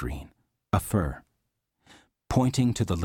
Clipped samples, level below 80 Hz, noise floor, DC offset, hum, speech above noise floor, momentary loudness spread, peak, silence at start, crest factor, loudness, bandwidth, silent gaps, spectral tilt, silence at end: under 0.1%; -42 dBFS; -79 dBFS; under 0.1%; none; 53 dB; 14 LU; -10 dBFS; 0 s; 18 dB; -27 LUFS; 17.5 kHz; none; -6.5 dB/octave; 0 s